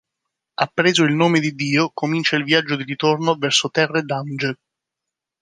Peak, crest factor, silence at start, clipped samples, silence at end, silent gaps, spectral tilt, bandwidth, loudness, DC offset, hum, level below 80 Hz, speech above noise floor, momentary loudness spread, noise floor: -2 dBFS; 18 dB; 0.6 s; under 0.1%; 0.85 s; none; -4.5 dB/octave; 10 kHz; -19 LUFS; under 0.1%; none; -68 dBFS; 65 dB; 9 LU; -84 dBFS